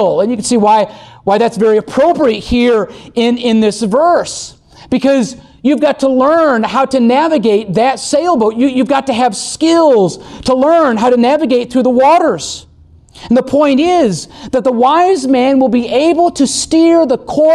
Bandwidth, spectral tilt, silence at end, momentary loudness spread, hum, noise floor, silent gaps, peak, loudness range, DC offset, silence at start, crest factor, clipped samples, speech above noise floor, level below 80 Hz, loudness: 12 kHz; -4.5 dB/octave; 0 s; 6 LU; none; -41 dBFS; none; -2 dBFS; 2 LU; under 0.1%; 0 s; 10 dB; under 0.1%; 30 dB; -42 dBFS; -11 LUFS